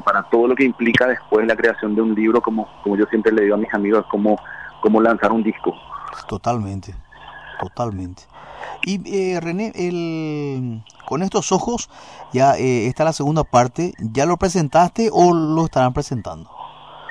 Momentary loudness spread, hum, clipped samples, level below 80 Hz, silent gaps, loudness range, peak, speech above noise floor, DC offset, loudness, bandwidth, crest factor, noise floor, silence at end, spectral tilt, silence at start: 17 LU; none; under 0.1%; -46 dBFS; none; 8 LU; -2 dBFS; 20 dB; 0.2%; -19 LUFS; 11 kHz; 16 dB; -38 dBFS; 0 s; -6 dB/octave; 0 s